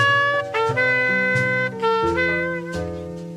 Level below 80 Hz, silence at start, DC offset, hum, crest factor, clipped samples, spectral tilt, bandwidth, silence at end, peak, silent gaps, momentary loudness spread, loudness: -48 dBFS; 0 s; under 0.1%; none; 14 dB; under 0.1%; -5.5 dB/octave; 13.5 kHz; 0 s; -6 dBFS; none; 11 LU; -20 LUFS